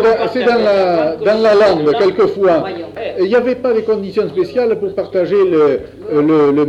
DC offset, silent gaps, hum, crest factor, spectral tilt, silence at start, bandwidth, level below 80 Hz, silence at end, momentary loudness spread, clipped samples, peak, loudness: under 0.1%; none; none; 12 dB; -7 dB/octave; 0 s; 8.2 kHz; -48 dBFS; 0 s; 7 LU; under 0.1%; -2 dBFS; -14 LUFS